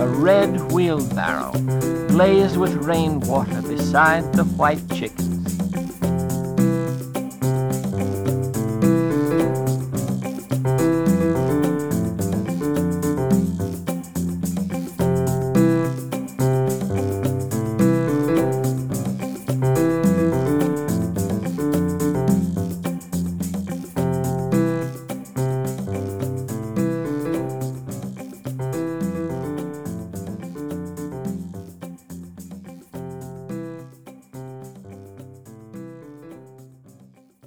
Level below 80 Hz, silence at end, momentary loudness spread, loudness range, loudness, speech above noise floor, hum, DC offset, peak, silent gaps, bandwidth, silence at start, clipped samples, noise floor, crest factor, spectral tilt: -48 dBFS; 0.55 s; 18 LU; 15 LU; -22 LUFS; 32 dB; none; 0.2%; -4 dBFS; none; over 20 kHz; 0 s; under 0.1%; -51 dBFS; 18 dB; -7 dB/octave